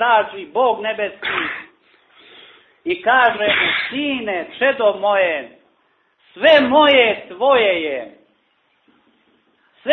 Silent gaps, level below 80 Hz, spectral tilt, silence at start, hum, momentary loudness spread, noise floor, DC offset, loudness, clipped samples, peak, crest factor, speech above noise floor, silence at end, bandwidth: none; -60 dBFS; -5.5 dB/octave; 0 s; none; 14 LU; -63 dBFS; under 0.1%; -16 LUFS; under 0.1%; -2 dBFS; 16 dB; 46 dB; 0 s; 6 kHz